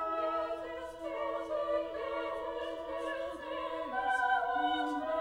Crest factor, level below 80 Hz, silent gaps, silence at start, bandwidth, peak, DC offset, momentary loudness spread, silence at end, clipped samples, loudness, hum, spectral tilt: 16 dB; -64 dBFS; none; 0 s; 16 kHz; -20 dBFS; under 0.1%; 9 LU; 0 s; under 0.1%; -35 LUFS; none; -4 dB/octave